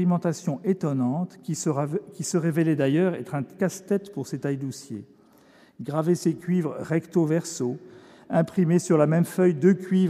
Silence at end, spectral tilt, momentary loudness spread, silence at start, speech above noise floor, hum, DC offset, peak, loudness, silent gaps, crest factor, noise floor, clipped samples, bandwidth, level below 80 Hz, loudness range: 0 s; -7 dB/octave; 10 LU; 0 s; 31 dB; none; under 0.1%; -8 dBFS; -25 LUFS; none; 18 dB; -55 dBFS; under 0.1%; 14.5 kHz; -74 dBFS; 5 LU